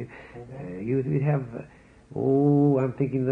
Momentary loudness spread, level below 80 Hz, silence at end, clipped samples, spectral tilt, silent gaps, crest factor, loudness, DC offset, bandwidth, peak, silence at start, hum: 20 LU; -58 dBFS; 0 s; under 0.1%; -11.5 dB/octave; none; 14 dB; -24 LUFS; under 0.1%; 3.1 kHz; -12 dBFS; 0 s; none